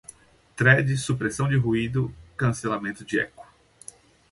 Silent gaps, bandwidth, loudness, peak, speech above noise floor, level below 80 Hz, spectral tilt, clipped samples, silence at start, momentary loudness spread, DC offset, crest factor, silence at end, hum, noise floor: none; 11.5 kHz; -24 LUFS; -4 dBFS; 27 dB; -52 dBFS; -6 dB/octave; under 0.1%; 0.55 s; 25 LU; under 0.1%; 22 dB; 0.9 s; none; -50 dBFS